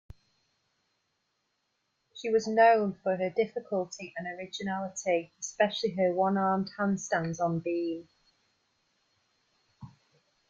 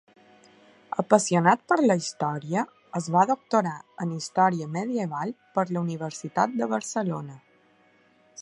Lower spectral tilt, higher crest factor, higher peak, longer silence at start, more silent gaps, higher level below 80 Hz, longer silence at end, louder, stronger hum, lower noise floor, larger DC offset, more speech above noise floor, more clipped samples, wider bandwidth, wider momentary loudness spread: about the same, -5 dB/octave vs -5.5 dB/octave; about the same, 20 dB vs 24 dB; second, -10 dBFS vs -2 dBFS; first, 2.15 s vs 0.95 s; neither; about the same, -70 dBFS vs -74 dBFS; first, 0.65 s vs 0 s; second, -29 LUFS vs -26 LUFS; neither; first, -79 dBFS vs -61 dBFS; neither; first, 50 dB vs 36 dB; neither; second, 7.8 kHz vs 11.5 kHz; first, 15 LU vs 11 LU